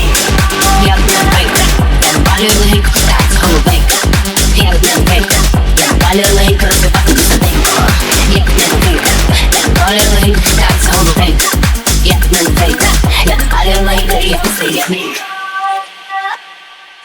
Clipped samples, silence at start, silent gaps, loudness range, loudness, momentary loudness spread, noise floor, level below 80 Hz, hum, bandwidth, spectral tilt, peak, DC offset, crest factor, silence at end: 0.2%; 0 s; none; 3 LU; -9 LUFS; 5 LU; -35 dBFS; -12 dBFS; none; over 20 kHz; -3.5 dB/octave; 0 dBFS; under 0.1%; 8 dB; 0.3 s